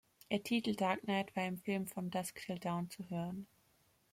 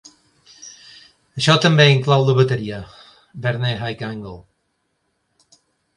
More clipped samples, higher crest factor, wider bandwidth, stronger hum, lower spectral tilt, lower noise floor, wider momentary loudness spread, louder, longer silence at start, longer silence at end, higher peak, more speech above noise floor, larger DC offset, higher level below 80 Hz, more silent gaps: neither; about the same, 18 dB vs 20 dB; first, 16.5 kHz vs 11 kHz; neither; about the same, -5.5 dB/octave vs -5.5 dB/octave; about the same, -73 dBFS vs -70 dBFS; second, 8 LU vs 26 LU; second, -39 LUFS vs -17 LUFS; second, 0.3 s vs 0.6 s; second, 0.65 s vs 1.55 s; second, -22 dBFS vs 0 dBFS; second, 35 dB vs 53 dB; neither; second, -76 dBFS vs -54 dBFS; neither